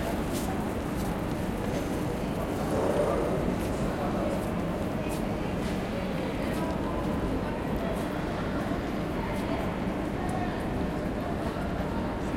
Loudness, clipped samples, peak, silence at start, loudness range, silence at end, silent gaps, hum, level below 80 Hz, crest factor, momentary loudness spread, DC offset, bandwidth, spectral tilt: -31 LUFS; under 0.1%; -14 dBFS; 0 s; 2 LU; 0 s; none; none; -40 dBFS; 14 dB; 3 LU; under 0.1%; 16.5 kHz; -6.5 dB/octave